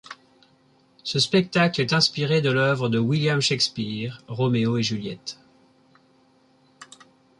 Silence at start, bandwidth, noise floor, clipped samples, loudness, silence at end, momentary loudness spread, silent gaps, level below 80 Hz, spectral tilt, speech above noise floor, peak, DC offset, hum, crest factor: 0.1 s; 11.5 kHz; -60 dBFS; under 0.1%; -22 LUFS; 0.55 s; 14 LU; none; -62 dBFS; -5 dB/octave; 37 dB; -6 dBFS; under 0.1%; none; 20 dB